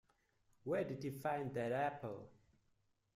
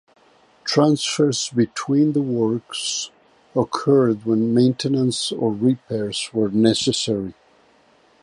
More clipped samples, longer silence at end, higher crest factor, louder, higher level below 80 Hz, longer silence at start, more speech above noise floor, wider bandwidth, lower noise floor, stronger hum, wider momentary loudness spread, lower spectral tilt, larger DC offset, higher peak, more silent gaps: neither; about the same, 0.85 s vs 0.9 s; about the same, 18 dB vs 18 dB; second, -42 LUFS vs -20 LUFS; second, -78 dBFS vs -60 dBFS; about the same, 0.65 s vs 0.65 s; about the same, 38 dB vs 37 dB; first, 15.5 kHz vs 11.5 kHz; first, -80 dBFS vs -56 dBFS; neither; first, 11 LU vs 7 LU; first, -7 dB/octave vs -5 dB/octave; neither; second, -26 dBFS vs -2 dBFS; neither